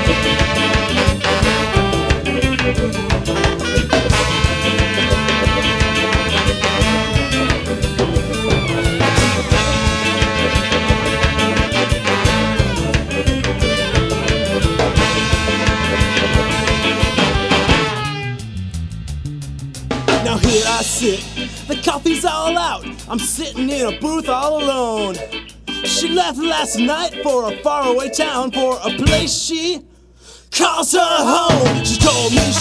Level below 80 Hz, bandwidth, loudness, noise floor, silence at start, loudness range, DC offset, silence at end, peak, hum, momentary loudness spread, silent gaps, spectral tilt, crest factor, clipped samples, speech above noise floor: -26 dBFS; 11 kHz; -16 LUFS; -43 dBFS; 0 s; 4 LU; under 0.1%; 0 s; 0 dBFS; none; 8 LU; none; -4 dB/octave; 16 dB; under 0.1%; 27 dB